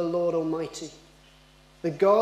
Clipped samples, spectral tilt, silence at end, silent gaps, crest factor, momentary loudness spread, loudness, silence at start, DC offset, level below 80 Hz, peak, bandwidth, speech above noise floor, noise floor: under 0.1%; -6 dB/octave; 0 s; none; 18 dB; 15 LU; -27 LUFS; 0 s; under 0.1%; -62 dBFS; -10 dBFS; 13.5 kHz; 31 dB; -55 dBFS